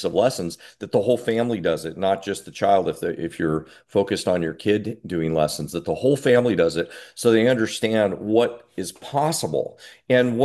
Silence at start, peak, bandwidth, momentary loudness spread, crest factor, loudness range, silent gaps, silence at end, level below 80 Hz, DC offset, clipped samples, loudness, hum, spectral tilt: 0 s; -4 dBFS; 12.5 kHz; 10 LU; 18 dB; 3 LU; none; 0 s; -52 dBFS; under 0.1%; under 0.1%; -22 LUFS; none; -5.5 dB/octave